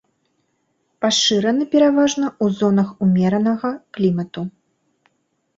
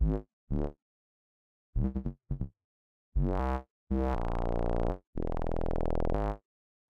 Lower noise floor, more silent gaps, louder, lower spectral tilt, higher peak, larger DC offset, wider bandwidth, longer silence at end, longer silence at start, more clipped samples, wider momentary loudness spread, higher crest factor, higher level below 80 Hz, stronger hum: second, -68 dBFS vs under -90 dBFS; second, none vs 0.33-0.47 s, 0.82-1.73 s, 2.64-3.12 s, 3.70-3.87 s, 5.07-5.13 s; first, -18 LUFS vs -35 LUFS; second, -5 dB/octave vs -9.5 dB/octave; first, -4 dBFS vs -16 dBFS; neither; first, 8 kHz vs 5.2 kHz; first, 1.1 s vs 0.5 s; first, 1 s vs 0 s; neither; about the same, 10 LU vs 8 LU; about the same, 16 dB vs 16 dB; second, -60 dBFS vs -34 dBFS; neither